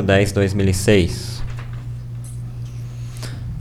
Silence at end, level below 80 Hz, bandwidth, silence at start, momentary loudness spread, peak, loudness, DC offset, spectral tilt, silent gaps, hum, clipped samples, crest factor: 0 s; -34 dBFS; 15 kHz; 0 s; 15 LU; -4 dBFS; -21 LUFS; under 0.1%; -6 dB/octave; none; none; under 0.1%; 18 dB